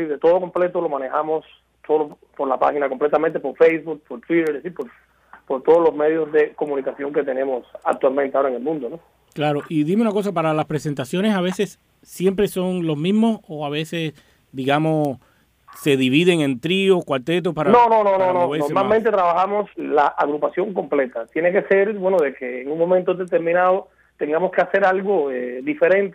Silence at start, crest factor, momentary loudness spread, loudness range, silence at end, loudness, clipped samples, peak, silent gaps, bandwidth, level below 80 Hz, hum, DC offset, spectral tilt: 0 s; 16 dB; 10 LU; 5 LU; 0 s; -20 LUFS; under 0.1%; -4 dBFS; none; 15.5 kHz; -60 dBFS; none; under 0.1%; -6.5 dB/octave